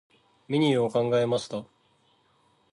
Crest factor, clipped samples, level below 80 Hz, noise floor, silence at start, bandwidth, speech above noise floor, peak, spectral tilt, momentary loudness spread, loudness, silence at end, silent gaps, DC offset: 16 dB; under 0.1%; -70 dBFS; -66 dBFS; 0.5 s; 11.5 kHz; 41 dB; -12 dBFS; -6.5 dB/octave; 11 LU; -26 LUFS; 1.1 s; none; under 0.1%